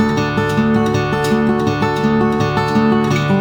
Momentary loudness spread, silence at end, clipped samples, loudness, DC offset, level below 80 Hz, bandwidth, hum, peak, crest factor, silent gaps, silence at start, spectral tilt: 2 LU; 0 s; under 0.1%; -15 LUFS; under 0.1%; -38 dBFS; 18.5 kHz; none; -2 dBFS; 14 dB; none; 0 s; -6.5 dB/octave